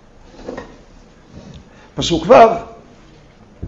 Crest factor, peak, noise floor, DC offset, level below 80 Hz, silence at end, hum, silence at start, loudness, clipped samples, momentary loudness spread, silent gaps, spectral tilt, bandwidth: 18 dB; 0 dBFS; -44 dBFS; under 0.1%; -42 dBFS; 0 s; none; 0.45 s; -12 LUFS; 0.1%; 26 LU; none; -5 dB/octave; 8 kHz